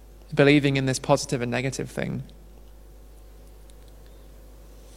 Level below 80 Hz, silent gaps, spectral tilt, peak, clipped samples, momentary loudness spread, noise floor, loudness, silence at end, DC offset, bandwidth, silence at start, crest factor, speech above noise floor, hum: -48 dBFS; none; -5.5 dB/octave; -4 dBFS; under 0.1%; 14 LU; -47 dBFS; -24 LUFS; 0 s; under 0.1%; 15.5 kHz; 0 s; 24 dB; 24 dB; none